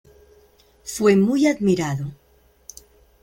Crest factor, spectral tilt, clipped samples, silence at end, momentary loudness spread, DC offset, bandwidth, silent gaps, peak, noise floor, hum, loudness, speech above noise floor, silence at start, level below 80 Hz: 18 dB; -6 dB/octave; under 0.1%; 1.1 s; 25 LU; under 0.1%; 17 kHz; none; -4 dBFS; -55 dBFS; none; -19 LUFS; 36 dB; 0.85 s; -56 dBFS